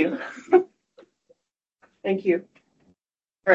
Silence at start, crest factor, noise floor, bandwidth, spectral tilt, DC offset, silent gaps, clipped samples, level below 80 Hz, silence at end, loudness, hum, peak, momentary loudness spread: 0 s; 22 dB; under -90 dBFS; 7.6 kHz; -7 dB/octave; under 0.1%; none; under 0.1%; -76 dBFS; 0 s; -24 LUFS; none; -4 dBFS; 13 LU